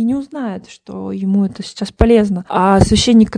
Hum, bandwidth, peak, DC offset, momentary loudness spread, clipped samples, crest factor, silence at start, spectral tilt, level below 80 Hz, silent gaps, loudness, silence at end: none; 10.5 kHz; 0 dBFS; under 0.1%; 15 LU; 0.2%; 14 dB; 0 s; -6 dB/octave; -28 dBFS; none; -14 LUFS; 0 s